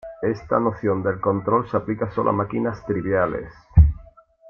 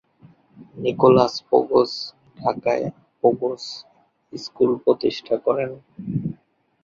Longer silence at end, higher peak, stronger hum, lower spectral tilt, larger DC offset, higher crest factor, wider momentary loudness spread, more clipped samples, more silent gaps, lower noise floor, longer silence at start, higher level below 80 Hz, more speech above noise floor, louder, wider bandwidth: about the same, 0.45 s vs 0.5 s; about the same, -2 dBFS vs -2 dBFS; neither; first, -10.5 dB/octave vs -6.5 dB/octave; neither; about the same, 20 dB vs 20 dB; second, 9 LU vs 18 LU; neither; neither; second, -48 dBFS vs -56 dBFS; second, 0.05 s vs 0.6 s; first, -30 dBFS vs -60 dBFS; second, 27 dB vs 36 dB; about the same, -22 LUFS vs -21 LUFS; second, 6 kHz vs 7.4 kHz